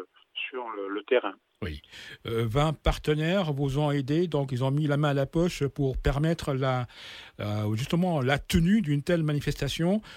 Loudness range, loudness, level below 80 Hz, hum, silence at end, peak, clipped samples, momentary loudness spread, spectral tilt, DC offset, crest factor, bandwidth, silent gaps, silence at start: 2 LU; -28 LUFS; -40 dBFS; none; 0 s; -10 dBFS; under 0.1%; 13 LU; -6.5 dB/octave; under 0.1%; 18 dB; 16 kHz; none; 0 s